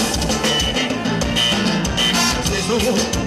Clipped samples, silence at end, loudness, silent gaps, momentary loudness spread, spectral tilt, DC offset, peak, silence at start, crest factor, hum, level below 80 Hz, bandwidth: under 0.1%; 0 s; -17 LUFS; none; 4 LU; -3 dB/octave; under 0.1%; -8 dBFS; 0 s; 12 dB; none; -32 dBFS; 16 kHz